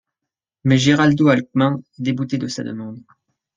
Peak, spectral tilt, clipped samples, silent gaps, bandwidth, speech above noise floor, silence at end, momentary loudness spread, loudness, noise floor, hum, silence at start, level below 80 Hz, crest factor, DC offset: -2 dBFS; -6 dB/octave; under 0.1%; none; 9.2 kHz; 67 dB; 0.55 s; 14 LU; -18 LUFS; -84 dBFS; none; 0.65 s; -56 dBFS; 18 dB; under 0.1%